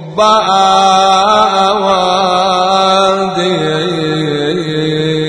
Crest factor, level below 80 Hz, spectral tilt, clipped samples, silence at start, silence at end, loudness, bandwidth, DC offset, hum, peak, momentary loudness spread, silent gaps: 10 dB; -48 dBFS; -4.5 dB/octave; under 0.1%; 0 s; 0 s; -10 LUFS; 10.5 kHz; under 0.1%; none; 0 dBFS; 6 LU; none